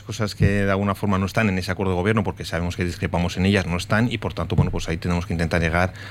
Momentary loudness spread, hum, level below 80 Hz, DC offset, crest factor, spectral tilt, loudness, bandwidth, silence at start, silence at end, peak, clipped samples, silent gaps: 6 LU; none; -36 dBFS; under 0.1%; 16 dB; -6 dB/octave; -22 LUFS; 15 kHz; 0 s; 0 s; -6 dBFS; under 0.1%; none